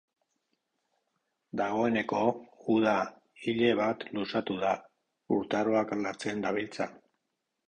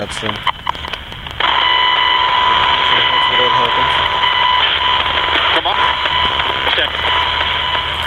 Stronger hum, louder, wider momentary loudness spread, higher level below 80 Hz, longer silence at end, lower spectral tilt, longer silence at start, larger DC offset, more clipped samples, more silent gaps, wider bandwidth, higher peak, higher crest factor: neither; second, -31 LUFS vs -13 LUFS; about the same, 10 LU vs 8 LU; second, -68 dBFS vs -36 dBFS; first, 0.75 s vs 0 s; first, -6 dB/octave vs -3 dB/octave; first, 1.55 s vs 0 s; neither; neither; neither; second, 9.8 kHz vs 13.5 kHz; second, -12 dBFS vs 0 dBFS; first, 20 dB vs 14 dB